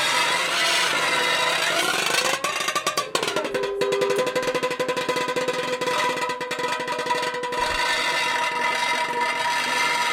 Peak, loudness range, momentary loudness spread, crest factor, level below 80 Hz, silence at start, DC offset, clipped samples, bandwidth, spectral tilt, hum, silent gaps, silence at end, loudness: -6 dBFS; 3 LU; 5 LU; 18 dB; -58 dBFS; 0 s; under 0.1%; under 0.1%; 16.5 kHz; -1 dB/octave; none; none; 0 s; -22 LUFS